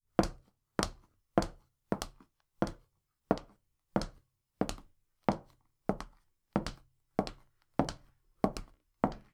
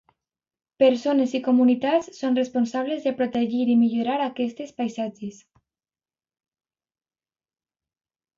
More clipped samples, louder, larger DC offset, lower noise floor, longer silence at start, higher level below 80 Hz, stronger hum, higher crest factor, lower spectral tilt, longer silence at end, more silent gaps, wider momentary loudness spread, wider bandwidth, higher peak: neither; second, -38 LUFS vs -23 LUFS; neither; second, -74 dBFS vs under -90 dBFS; second, 0.2 s vs 0.8 s; first, -50 dBFS vs -70 dBFS; neither; first, 30 dB vs 18 dB; about the same, -5.5 dB/octave vs -5.5 dB/octave; second, 0.15 s vs 3.05 s; neither; about the same, 11 LU vs 11 LU; first, 16 kHz vs 7.4 kHz; about the same, -8 dBFS vs -8 dBFS